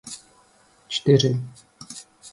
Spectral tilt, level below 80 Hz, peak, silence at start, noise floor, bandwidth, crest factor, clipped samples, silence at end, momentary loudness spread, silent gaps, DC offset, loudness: -5.5 dB/octave; -60 dBFS; -4 dBFS; 0.05 s; -58 dBFS; 11.5 kHz; 22 dB; under 0.1%; 0.05 s; 21 LU; none; under 0.1%; -21 LUFS